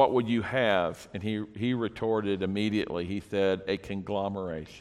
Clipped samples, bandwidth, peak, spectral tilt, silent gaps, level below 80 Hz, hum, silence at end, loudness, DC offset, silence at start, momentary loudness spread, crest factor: under 0.1%; 13 kHz; -8 dBFS; -6.5 dB/octave; none; -58 dBFS; none; 0 s; -30 LUFS; under 0.1%; 0 s; 8 LU; 20 dB